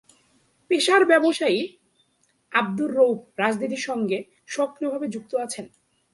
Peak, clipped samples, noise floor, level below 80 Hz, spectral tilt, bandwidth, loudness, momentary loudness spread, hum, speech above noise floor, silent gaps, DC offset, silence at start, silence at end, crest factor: -4 dBFS; under 0.1%; -67 dBFS; -74 dBFS; -4 dB/octave; 11.5 kHz; -23 LUFS; 12 LU; none; 45 dB; none; under 0.1%; 0.7 s; 0.45 s; 20 dB